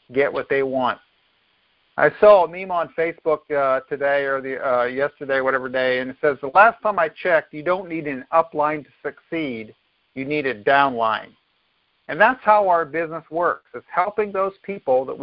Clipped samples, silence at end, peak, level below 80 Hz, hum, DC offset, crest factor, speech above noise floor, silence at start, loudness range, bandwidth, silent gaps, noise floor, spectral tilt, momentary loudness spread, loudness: under 0.1%; 0 s; 0 dBFS; -60 dBFS; none; under 0.1%; 20 dB; 46 dB; 0.1 s; 4 LU; 5.4 kHz; none; -66 dBFS; -9.5 dB/octave; 13 LU; -20 LUFS